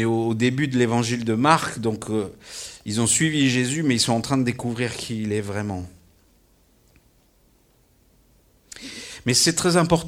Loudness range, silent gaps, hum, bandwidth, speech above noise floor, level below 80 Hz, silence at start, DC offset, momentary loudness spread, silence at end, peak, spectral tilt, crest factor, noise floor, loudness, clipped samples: 14 LU; none; none; 16.5 kHz; 38 dB; -54 dBFS; 0 s; under 0.1%; 17 LU; 0 s; -2 dBFS; -4 dB/octave; 22 dB; -60 dBFS; -22 LUFS; under 0.1%